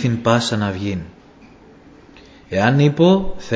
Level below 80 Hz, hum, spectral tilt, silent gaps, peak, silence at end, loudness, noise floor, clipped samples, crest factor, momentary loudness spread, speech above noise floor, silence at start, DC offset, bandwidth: -42 dBFS; none; -6.5 dB/octave; none; 0 dBFS; 0 s; -17 LUFS; -45 dBFS; under 0.1%; 18 dB; 12 LU; 29 dB; 0 s; under 0.1%; 8 kHz